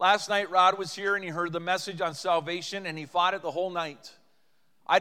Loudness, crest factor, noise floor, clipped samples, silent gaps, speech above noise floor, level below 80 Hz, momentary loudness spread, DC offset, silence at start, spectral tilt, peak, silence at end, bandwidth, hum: -28 LUFS; 20 dB; -73 dBFS; under 0.1%; none; 45 dB; -86 dBFS; 11 LU; under 0.1%; 0 s; -3 dB/octave; -8 dBFS; 0 s; 15.5 kHz; none